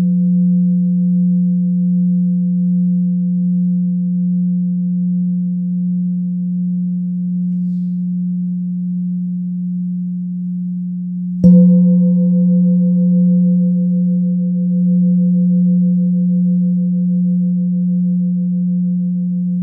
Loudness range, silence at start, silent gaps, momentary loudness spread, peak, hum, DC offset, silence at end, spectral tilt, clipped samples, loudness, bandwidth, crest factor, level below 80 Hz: 7 LU; 0 s; none; 8 LU; 0 dBFS; none; under 0.1%; 0 s; -15 dB/octave; under 0.1%; -15 LUFS; 0.7 kHz; 14 dB; -54 dBFS